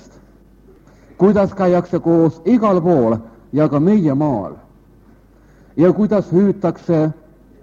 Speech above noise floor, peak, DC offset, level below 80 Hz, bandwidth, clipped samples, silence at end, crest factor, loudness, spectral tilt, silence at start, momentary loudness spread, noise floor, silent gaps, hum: 33 dB; 0 dBFS; under 0.1%; -48 dBFS; 7.2 kHz; under 0.1%; 0.5 s; 16 dB; -16 LUFS; -10 dB/octave; 1.2 s; 9 LU; -47 dBFS; none; none